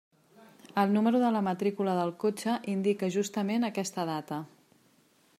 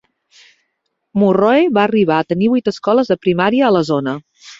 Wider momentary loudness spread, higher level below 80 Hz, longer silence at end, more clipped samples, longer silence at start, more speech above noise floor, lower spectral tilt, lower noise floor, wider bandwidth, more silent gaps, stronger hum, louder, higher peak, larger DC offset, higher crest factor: first, 10 LU vs 7 LU; second, -80 dBFS vs -56 dBFS; first, 0.95 s vs 0.05 s; neither; second, 0.75 s vs 1.15 s; second, 37 dB vs 57 dB; about the same, -6 dB/octave vs -7 dB/octave; second, -65 dBFS vs -71 dBFS; first, 15.5 kHz vs 7.8 kHz; neither; neither; second, -30 LUFS vs -15 LUFS; second, -12 dBFS vs -2 dBFS; neither; about the same, 18 dB vs 14 dB